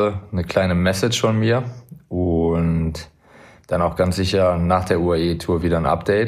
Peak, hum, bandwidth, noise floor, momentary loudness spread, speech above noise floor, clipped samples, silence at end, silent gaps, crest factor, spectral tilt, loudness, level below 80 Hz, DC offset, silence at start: -2 dBFS; none; 15 kHz; -47 dBFS; 7 LU; 29 dB; under 0.1%; 0 s; none; 16 dB; -6 dB/octave; -20 LUFS; -38 dBFS; under 0.1%; 0 s